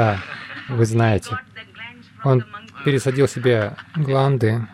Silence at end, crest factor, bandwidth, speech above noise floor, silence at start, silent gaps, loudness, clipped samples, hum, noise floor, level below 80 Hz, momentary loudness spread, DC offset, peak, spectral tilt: 0 s; 14 dB; 12.5 kHz; 21 dB; 0 s; none; -20 LUFS; under 0.1%; none; -39 dBFS; -54 dBFS; 18 LU; under 0.1%; -6 dBFS; -7 dB/octave